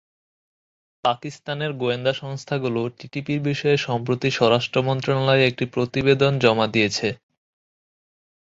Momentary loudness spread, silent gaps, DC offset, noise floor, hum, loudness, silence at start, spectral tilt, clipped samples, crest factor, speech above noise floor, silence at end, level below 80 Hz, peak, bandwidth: 10 LU; none; under 0.1%; under -90 dBFS; none; -22 LUFS; 1.05 s; -5.5 dB/octave; under 0.1%; 20 dB; over 69 dB; 1.3 s; -56 dBFS; -4 dBFS; 7.8 kHz